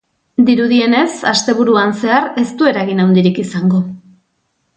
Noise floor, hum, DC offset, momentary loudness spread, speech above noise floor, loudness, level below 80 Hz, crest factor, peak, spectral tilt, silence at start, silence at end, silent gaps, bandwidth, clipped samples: -65 dBFS; none; under 0.1%; 5 LU; 53 dB; -13 LUFS; -58 dBFS; 14 dB; 0 dBFS; -5.5 dB/octave; 0.4 s; 0.8 s; none; 9.2 kHz; under 0.1%